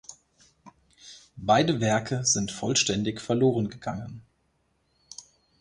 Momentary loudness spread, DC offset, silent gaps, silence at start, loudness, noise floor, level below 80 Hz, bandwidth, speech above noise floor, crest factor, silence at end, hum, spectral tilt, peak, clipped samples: 23 LU; under 0.1%; none; 0.1 s; -25 LUFS; -71 dBFS; -58 dBFS; 11 kHz; 45 dB; 20 dB; 0.4 s; none; -4 dB/octave; -8 dBFS; under 0.1%